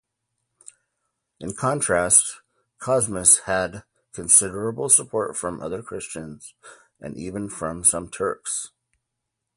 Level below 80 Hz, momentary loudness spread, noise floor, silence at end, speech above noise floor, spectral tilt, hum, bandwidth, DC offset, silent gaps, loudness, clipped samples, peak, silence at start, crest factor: -54 dBFS; 20 LU; -81 dBFS; 0.9 s; 58 dB; -2.5 dB/octave; none; 12 kHz; under 0.1%; none; -20 LUFS; under 0.1%; 0 dBFS; 1.4 s; 24 dB